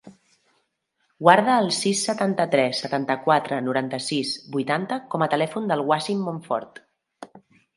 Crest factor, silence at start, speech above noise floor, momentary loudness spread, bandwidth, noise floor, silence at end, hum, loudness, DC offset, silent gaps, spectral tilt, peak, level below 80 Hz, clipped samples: 24 dB; 0.05 s; 50 dB; 10 LU; 11.5 kHz; -73 dBFS; 0.4 s; none; -23 LUFS; under 0.1%; none; -4.5 dB/octave; 0 dBFS; -74 dBFS; under 0.1%